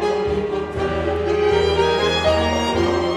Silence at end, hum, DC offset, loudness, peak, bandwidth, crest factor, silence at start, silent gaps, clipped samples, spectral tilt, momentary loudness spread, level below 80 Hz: 0 s; none; under 0.1%; -19 LUFS; -4 dBFS; 12 kHz; 14 dB; 0 s; none; under 0.1%; -5.5 dB/octave; 6 LU; -34 dBFS